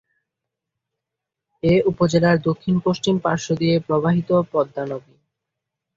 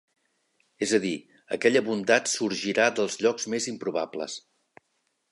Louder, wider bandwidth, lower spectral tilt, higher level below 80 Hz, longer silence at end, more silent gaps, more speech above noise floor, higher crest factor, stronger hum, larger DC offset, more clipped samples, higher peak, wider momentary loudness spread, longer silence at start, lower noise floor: first, -20 LUFS vs -26 LUFS; second, 7.8 kHz vs 11.5 kHz; first, -6.5 dB/octave vs -3 dB/octave; first, -52 dBFS vs -74 dBFS; about the same, 1 s vs 0.9 s; neither; first, 65 dB vs 49 dB; about the same, 18 dB vs 22 dB; neither; neither; neither; about the same, -4 dBFS vs -6 dBFS; second, 8 LU vs 12 LU; first, 1.65 s vs 0.8 s; first, -84 dBFS vs -75 dBFS